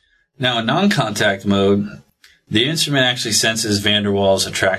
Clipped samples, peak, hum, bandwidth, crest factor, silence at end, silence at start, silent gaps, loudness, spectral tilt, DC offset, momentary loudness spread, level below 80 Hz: under 0.1%; 0 dBFS; none; 14 kHz; 18 dB; 0 s; 0.4 s; none; -16 LUFS; -3.5 dB/octave; under 0.1%; 4 LU; -46 dBFS